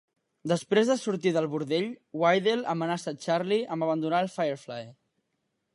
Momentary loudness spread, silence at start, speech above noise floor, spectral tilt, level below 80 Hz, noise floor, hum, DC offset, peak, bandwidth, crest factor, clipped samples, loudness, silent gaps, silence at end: 11 LU; 0.45 s; 52 dB; -5.5 dB/octave; -80 dBFS; -79 dBFS; none; under 0.1%; -10 dBFS; 11.5 kHz; 18 dB; under 0.1%; -28 LUFS; none; 0.85 s